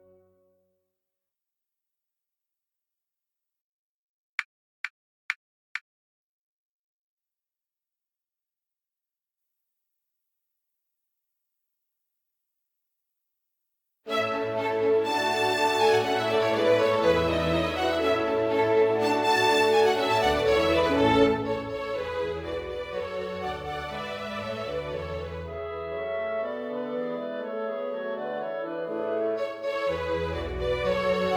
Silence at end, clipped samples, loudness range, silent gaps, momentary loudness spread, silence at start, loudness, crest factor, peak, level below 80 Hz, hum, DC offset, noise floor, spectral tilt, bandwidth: 0 s; under 0.1%; 17 LU; 4.45-4.84 s, 4.90-5.29 s, 5.36-5.75 s, 5.81-7.17 s; 13 LU; 4.4 s; -26 LUFS; 20 dB; -8 dBFS; -50 dBFS; none; under 0.1%; under -90 dBFS; -5 dB/octave; 19.5 kHz